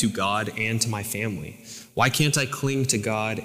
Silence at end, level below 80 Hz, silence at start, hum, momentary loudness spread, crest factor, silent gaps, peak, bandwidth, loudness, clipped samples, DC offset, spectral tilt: 0 s; -58 dBFS; 0 s; none; 13 LU; 18 dB; none; -8 dBFS; 16.5 kHz; -24 LUFS; under 0.1%; under 0.1%; -4 dB/octave